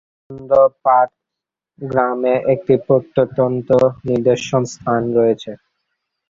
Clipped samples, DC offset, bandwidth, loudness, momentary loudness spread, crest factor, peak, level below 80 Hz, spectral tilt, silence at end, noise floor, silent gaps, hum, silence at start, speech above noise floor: under 0.1%; under 0.1%; 7.6 kHz; -16 LUFS; 8 LU; 16 dB; -2 dBFS; -54 dBFS; -7 dB/octave; 0.75 s; -84 dBFS; none; none; 0.3 s; 68 dB